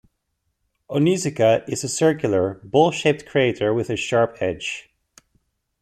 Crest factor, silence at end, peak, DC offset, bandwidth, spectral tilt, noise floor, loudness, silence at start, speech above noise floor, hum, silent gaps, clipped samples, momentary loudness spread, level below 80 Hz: 18 dB; 1 s; -4 dBFS; under 0.1%; 14 kHz; -5 dB/octave; -74 dBFS; -21 LUFS; 0.9 s; 54 dB; none; none; under 0.1%; 7 LU; -58 dBFS